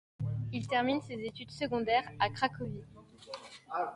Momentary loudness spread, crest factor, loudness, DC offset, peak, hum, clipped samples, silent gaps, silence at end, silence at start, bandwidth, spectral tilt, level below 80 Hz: 16 LU; 20 dB; -34 LUFS; under 0.1%; -16 dBFS; none; under 0.1%; none; 0 s; 0.2 s; 11.5 kHz; -6 dB/octave; -62 dBFS